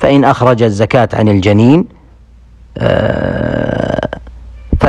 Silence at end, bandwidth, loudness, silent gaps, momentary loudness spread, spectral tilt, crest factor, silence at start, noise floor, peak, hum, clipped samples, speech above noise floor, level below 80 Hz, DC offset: 0 s; 9.8 kHz; -11 LUFS; none; 12 LU; -7.5 dB/octave; 12 dB; 0 s; -39 dBFS; 0 dBFS; none; 0.5%; 30 dB; -28 dBFS; under 0.1%